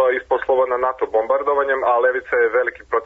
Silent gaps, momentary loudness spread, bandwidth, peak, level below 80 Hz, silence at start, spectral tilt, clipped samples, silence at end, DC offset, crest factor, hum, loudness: none; 4 LU; 3.9 kHz; -6 dBFS; -54 dBFS; 0 s; -5.5 dB/octave; under 0.1%; 0 s; under 0.1%; 12 dB; none; -19 LUFS